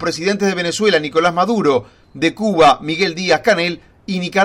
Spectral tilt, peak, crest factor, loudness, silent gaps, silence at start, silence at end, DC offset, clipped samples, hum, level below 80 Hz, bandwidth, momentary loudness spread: -4.5 dB/octave; -2 dBFS; 14 dB; -16 LUFS; none; 0 s; 0 s; under 0.1%; under 0.1%; none; -50 dBFS; 15.5 kHz; 8 LU